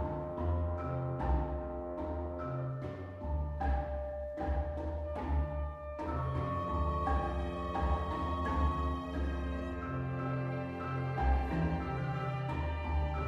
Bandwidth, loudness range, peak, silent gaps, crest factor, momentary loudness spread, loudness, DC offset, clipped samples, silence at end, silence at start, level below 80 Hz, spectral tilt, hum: 6 kHz; 3 LU; -20 dBFS; none; 16 dB; 6 LU; -36 LUFS; under 0.1%; under 0.1%; 0 s; 0 s; -38 dBFS; -9 dB/octave; none